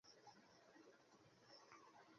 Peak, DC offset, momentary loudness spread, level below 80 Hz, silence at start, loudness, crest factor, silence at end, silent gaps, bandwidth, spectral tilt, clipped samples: -48 dBFS; under 0.1%; 4 LU; under -90 dBFS; 0.05 s; -67 LUFS; 20 dB; 0 s; none; 7.2 kHz; -2 dB/octave; under 0.1%